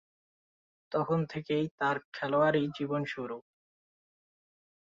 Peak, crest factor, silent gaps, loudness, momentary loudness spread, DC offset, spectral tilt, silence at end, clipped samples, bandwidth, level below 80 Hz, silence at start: -14 dBFS; 20 dB; 1.71-1.78 s, 2.05-2.12 s; -32 LUFS; 10 LU; under 0.1%; -7.5 dB/octave; 1.45 s; under 0.1%; 7.6 kHz; -72 dBFS; 0.9 s